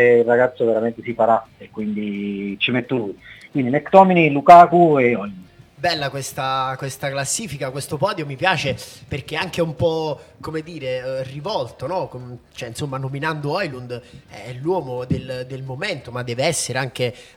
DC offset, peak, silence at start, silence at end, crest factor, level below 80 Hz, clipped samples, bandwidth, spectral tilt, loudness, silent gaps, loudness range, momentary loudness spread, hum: under 0.1%; 0 dBFS; 0 s; 0.15 s; 20 dB; -54 dBFS; under 0.1%; 16.5 kHz; -5 dB/octave; -19 LUFS; none; 12 LU; 17 LU; none